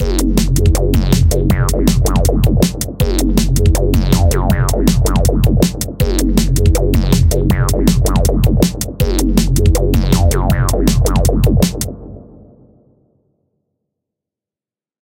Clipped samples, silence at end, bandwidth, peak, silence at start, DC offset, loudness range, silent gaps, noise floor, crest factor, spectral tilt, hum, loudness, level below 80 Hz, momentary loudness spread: under 0.1%; 2.8 s; 17 kHz; 0 dBFS; 0 s; under 0.1%; 4 LU; none; under -90 dBFS; 12 dB; -6 dB/octave; none; -14 LUFS; -16 dBFS; 4 LU